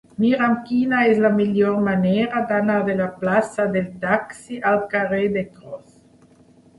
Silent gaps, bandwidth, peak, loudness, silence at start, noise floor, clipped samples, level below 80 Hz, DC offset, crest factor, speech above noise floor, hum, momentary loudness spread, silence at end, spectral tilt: none; 11.5 kHz; -4 dBFS; -20 LUFS; 0.2 s; -52 dBFS; under 0.1%; -58 dBFS; under 0.1%; 16 dB; 32 dB; none; 8 LU; 1 s; -7 dB/octave